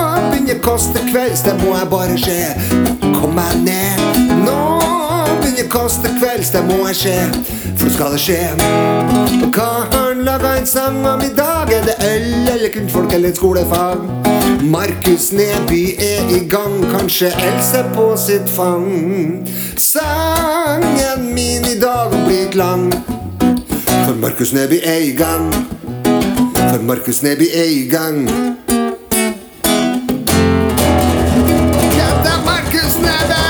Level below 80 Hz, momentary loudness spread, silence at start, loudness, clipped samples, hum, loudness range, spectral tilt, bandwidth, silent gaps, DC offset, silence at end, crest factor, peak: -30 dBFS; 4 LU; 0 s; -14 LUFS; under 0.1%; none; 1 LU; -4.5 dB/octave; over 20 kHz; none; under 0.1%; 0 s; 14 dB; 0 dBFS